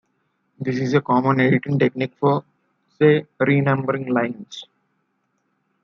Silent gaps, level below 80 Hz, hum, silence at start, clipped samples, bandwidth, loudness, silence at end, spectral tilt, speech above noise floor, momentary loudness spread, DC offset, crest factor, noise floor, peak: none; -66 dBFS; none; 0.6 s; under 0.1%; 6.8 kHz; -20 LUFS; 1.2 s; -8 dB/octave; 51 dB; 10 LU; under 0.1%; 18 dB; -70 dBFS; -2 dBFS